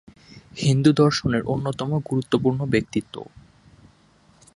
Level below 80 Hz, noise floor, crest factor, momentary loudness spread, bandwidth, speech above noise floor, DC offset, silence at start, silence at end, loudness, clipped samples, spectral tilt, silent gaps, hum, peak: -50 dBFS; -57 dBFS; 20 dB; 21 LU; 11.5 kHz; 35 dB; under 0.1%; 0.35 s; 1.35 s; -22 LUFS; under 0.1%; -6.5 dB/octave; none; none; -4 dBFS